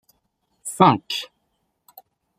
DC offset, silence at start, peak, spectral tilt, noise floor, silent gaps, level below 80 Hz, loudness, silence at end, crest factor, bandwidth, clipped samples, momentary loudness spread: under 0.1%; 0.65 s; -2 dBFS; -5 dB/octave; -73 dBFS; none; -64 dBFS; -19 LUFS; 1.15 s; 22 dB; 15.5 kHz; under 0.1%; 19 LU